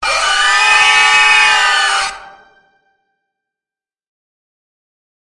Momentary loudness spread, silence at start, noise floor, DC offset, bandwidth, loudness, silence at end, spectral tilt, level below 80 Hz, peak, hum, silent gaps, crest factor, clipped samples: 7 LU; 0 s; under -90 dBFS; under 0.1%; 11.5 kHz; -9 LUFS; 3 s; 2.5 dB/octave; -50 dBFS; 0 dBFS; none; none; 14 dB; under 0.1%